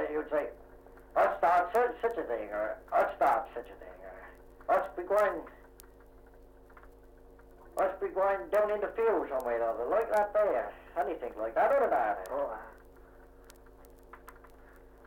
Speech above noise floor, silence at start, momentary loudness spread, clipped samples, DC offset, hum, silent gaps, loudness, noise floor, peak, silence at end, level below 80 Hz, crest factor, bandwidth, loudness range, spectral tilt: 24 dB; 0 s; 19 LU; under 0.1%; under 0.1%; none; none; -31 LUFS; -55 dBFS; -16 dBFS; 0.75 s; -58 dBFS; 16 dB; 16.5 kHz; 5 LU; -5.5 dB/octave